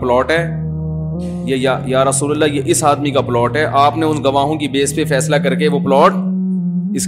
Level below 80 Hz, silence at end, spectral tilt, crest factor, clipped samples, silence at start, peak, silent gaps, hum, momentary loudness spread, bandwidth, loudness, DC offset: -40 dBFS; 0 s; -5 dB/octave; 14 dB; under 0.1%; 0 s; 0 dBFS; none; none; 8 LU; 15.5 kHz; -15 LUFS; under 0.1%